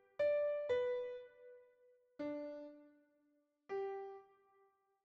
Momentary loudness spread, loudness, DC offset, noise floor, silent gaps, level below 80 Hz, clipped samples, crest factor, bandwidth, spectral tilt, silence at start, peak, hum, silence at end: 22 LU; -41 LUFS; under 0.1%; -79 dBFS; none; -84 dBFS; under 0.1%; 16 dB; 7.2 kHz; -3 dB/octave; 0.2 s; -28 dBFS; none; 0.8 s